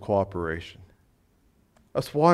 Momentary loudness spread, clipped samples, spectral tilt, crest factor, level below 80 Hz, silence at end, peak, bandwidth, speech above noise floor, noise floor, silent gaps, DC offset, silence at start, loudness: 12 LU; under 0.1%; -7 dB/octave; 20 dB; -56 dBFS; 0 s; -6 dBFS; 14.5 kHz; 40 dB; -64 dBFS; none; under 0.1%; 0 s; -28 LUFS